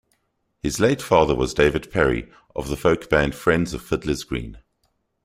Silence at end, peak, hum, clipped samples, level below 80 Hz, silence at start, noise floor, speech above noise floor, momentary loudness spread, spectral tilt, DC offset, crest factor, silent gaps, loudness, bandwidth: 0.65 s; -2 dBFS; none; under 0.1%; -38 dBFS; 0.65 s; -71 dBFS; 50 dB; 12 LU; -5.5 dB/octave; under 0.1%; 20 dB; none; -21 LUFS; 16 kHz